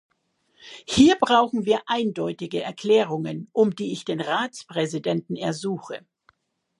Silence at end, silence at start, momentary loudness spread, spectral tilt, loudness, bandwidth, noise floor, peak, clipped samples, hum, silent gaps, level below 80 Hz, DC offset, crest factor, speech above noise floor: 0.85 s; 0.65 s; 12 LU; -5 dB/octave; -23 LUFS; 11.5 kHz; -68 dBFS; -4 dBFS; under 0.1%; none; none; -56 dBFS; under 0.1%; 20 dB; 45 dB